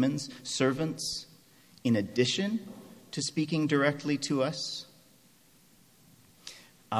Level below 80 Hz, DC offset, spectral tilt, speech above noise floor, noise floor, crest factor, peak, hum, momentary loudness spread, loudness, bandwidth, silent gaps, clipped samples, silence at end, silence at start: -70 dBFS; under 0.1%; -4.5 dB/octave; 32 dB; -61 dBFS; 22 dB; -10 dBFS; none; 20 LU; -30 LUFS; 15.5 kHz; none; under 0.1%; 0 s; 0 s